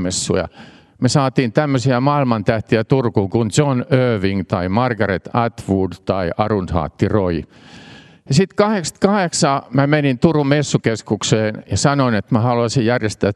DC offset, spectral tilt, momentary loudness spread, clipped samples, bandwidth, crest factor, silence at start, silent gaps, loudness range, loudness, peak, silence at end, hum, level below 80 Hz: under 0.1%; -5.5 dB/octave; 5 LU; under 0.1%; 12 kHz; 16 dB; 0 s; none; 3 LU; -17 LUFS; 0 dBFS; 0 s; none; -46 dBFS